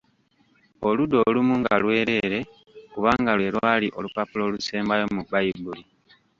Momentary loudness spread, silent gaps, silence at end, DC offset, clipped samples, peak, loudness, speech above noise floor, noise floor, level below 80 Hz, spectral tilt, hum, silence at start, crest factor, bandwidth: 10 LU; none; 0.55 s; under 0.1%; under 0.1%; -4 dBFS; -23 LUFS; 41 dB; -64 dBFS; -56 dBFS; -6 dB/octave; none; 0.8 s; 20 dB; 7.6 kHz